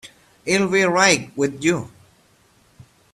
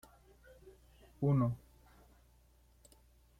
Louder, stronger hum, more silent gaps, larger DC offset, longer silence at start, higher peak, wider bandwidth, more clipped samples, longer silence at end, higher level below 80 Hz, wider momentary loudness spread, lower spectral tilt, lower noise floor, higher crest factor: first, -18 LUFS vs -35 LUFS; neither; neither; neither; second, 0.05 s vs 0.65 s; first, -2 dBFS vs -22 dBFS; about the same, 13.5 kHz vs 14 kHz; neither; second, 1.25 s vs 1.85 s; first, -58 dBFS vs -64 dBFS; second, 14 LU vs 28 LU; second, -3.5 dB/octave vs -10 dB/octave; second, -57 dBFS vs -67 dBFS; about the same, 20 dB vs 18 dB